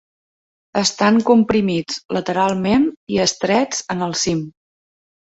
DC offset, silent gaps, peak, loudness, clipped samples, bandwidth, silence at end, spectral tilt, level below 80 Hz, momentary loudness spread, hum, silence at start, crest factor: under 0.1%; 2.05-2.09 s, 2.97-3.07 s; -2 dBFS; -18 LUFS; under 0.1%; 8 kHz; 0.75 s; -4 dB/octave; -52 dBFS; 9 LU; none; 0.75 s; 16 dB